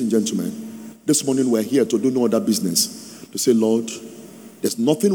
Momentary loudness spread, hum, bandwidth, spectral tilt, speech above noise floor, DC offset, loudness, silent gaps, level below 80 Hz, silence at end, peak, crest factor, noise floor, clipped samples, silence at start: 16 LU; none; over 20 kHz; -4.5 dB/octave; 21 dB; under 0.1%; -20 LUFS; none; -72 dBFS; 0 s; -4 dBFS; 16 dB; -40 dBFS; under 0.1%; 0 s